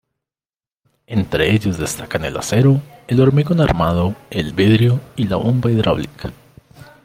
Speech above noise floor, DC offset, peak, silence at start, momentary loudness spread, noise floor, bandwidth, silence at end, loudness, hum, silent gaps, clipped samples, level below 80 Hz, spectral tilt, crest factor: over 74 dB; under 0.1%; -2 dBFS; 1.1 s; 9 LU; under -90 dBFS; 16 kHz; 0.75 s; -17 LUFS; none; none; under 0.1%; -40 dBFS; -6.5 dB/octave; 16 dB